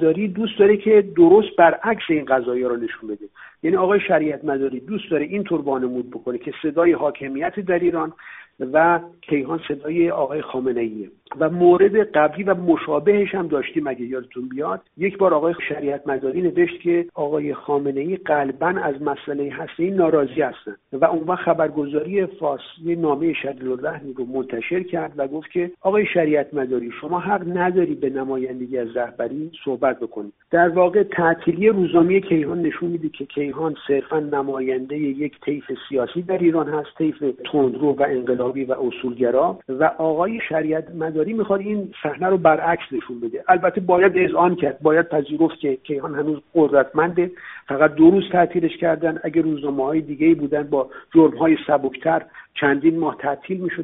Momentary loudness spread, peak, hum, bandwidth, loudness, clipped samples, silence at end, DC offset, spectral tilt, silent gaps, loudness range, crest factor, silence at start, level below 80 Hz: 11 LU; 0 dBFS; none; 3.9 kHz; -20 LUFS; under 0.1%; 0 s; under 0.1%; -5.5 dB/octave; none; 5 LU; 20 dB; 0 s; -60 dBFS